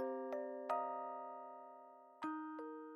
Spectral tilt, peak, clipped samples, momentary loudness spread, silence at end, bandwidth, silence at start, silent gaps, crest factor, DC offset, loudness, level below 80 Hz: -5.5 dB/octave; -26 dBFS; under 0.1%; 15 LU; 0 s; 11 kHz; 0 s; none; 20 dB; under 0.1%; -46 LUFS; under -90 dBFS